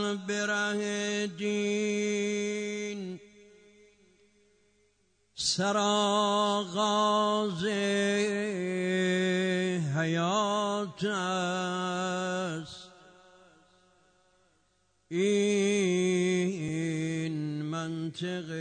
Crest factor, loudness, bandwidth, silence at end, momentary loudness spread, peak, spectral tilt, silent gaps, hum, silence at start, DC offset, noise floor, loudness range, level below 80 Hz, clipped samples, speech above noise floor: 14 dB; -29 LUFS; 9.6 kHz; 0 s; 9 LU; -16 dBFS; -4.5 dB/octave; none; none; 0 s; under 0.1%; -71 dBFS; 8 LU; -72 dBFS; under 0.1%; 42 dB